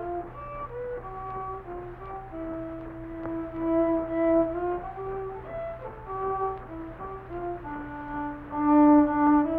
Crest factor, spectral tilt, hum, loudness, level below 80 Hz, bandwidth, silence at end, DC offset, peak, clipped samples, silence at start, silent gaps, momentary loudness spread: 18 dB; -10.5 dB/octave; none; -28 LUFS; -48 dBFS; 3.5 kHz; 0 s; under 0.1%; -10 dBFS; under 0.1%; 0 s; none; 18 LU